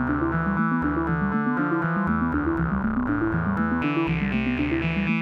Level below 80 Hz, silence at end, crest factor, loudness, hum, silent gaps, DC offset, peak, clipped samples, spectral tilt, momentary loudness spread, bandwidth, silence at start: -38 dBFS; 0 s; 14 dB; -24 LUFS; none; none; under 0.1%; -10 dBFS; under 0.1%; -9 dB/octave; 1 LU; 5.8 kHz; 0 s